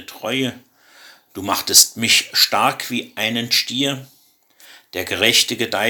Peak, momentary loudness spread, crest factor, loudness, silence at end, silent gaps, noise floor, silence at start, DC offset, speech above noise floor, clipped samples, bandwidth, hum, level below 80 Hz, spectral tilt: 0 dBFS; 16 LU; 20 dB; -16 LUFS; 0 s; none; -54 dBFS; 0 s; under 0.1%; 35 dB; under 0.1%; 19 kHz; none; -64 dBFS; -1 dB/octave